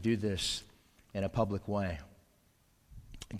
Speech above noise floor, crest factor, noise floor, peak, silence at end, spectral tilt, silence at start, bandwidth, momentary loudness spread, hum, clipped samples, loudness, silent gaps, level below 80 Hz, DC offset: 35 dB; 20 dB; -69 dBFS; -16 dBFS; 0 s; -5 dB/octave; 0 s; 15.5 kHz; 14 LU; none; under 0.1%; -35 LUFS; none; -52 dBFS; under 0.1%